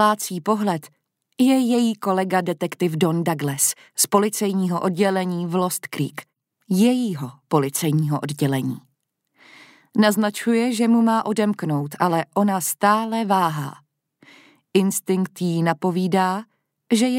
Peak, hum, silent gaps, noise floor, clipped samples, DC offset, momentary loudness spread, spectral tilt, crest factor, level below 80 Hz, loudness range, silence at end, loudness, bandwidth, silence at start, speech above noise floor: -2 dBFS; none; none; -72 dBFS; under 0.1%; under 0.1%; 7 LU; -5 dB/octave; 18 dB; -72 dBFS; 3 LU; 0 s; -21 LUFS; 16 kHz; 0 s; 52 dB